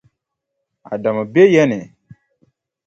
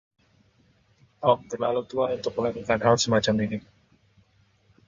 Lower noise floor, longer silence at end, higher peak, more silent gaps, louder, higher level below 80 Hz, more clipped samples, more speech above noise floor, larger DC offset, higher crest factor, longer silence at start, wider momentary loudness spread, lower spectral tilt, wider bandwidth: first, -77 dBFS vs -63 dBFS; second, 1 s vs 1.3 s; first, 0 dBFS vs -6 dBFS; neither; first, -15 LUFS vs -25 LUFS; about the same, -62 dBFS vs -58 dBFS; neither; first, 63 dB vs 39 dB; neither; about the same, 18 dB vs 22 dB; second, 0.9 s vs 1.2 s; first, 16 LU vs 7 LU; first, -7 dB/octave vs -4.5 dB/octave; second, 7.6 kHz vs 9.4 kHz